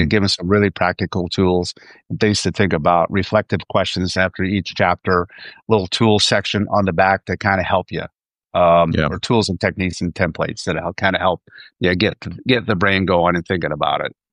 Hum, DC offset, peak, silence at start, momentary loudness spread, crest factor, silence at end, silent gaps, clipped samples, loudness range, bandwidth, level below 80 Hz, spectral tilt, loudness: none; under 0.1%; -2 dBFS; 0 s; 7 LU; 16 dB; 0.25 s; none; under 0.1%; 2 LU; 11 kHz; -44 dBFS; -5 dB/octave; -18 LUFS